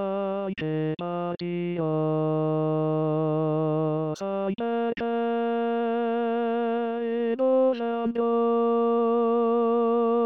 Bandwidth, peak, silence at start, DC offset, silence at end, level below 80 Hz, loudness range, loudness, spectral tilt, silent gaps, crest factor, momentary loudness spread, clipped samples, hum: 6.6 kHz; -14 dBFS; 0 s; 0.1%; 0 s; -70 dBFS; 3 LU; -26 LUFS; -9 dB/octave; none; 10 dB; 6 LU; under 0.1%; none